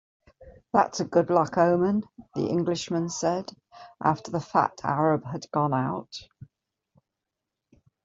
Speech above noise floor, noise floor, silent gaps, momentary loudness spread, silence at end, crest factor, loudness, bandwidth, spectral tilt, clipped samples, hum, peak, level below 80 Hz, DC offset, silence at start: 60 dB; -86 dBFS; none; 10 LU; 1.6 s; 22 dB; -26 LUFS; 7.8 kHz; -6 dB/octave; under 0.1%; none; -6 dBFS; -64 dBFS; under 0.1%; 0.4 s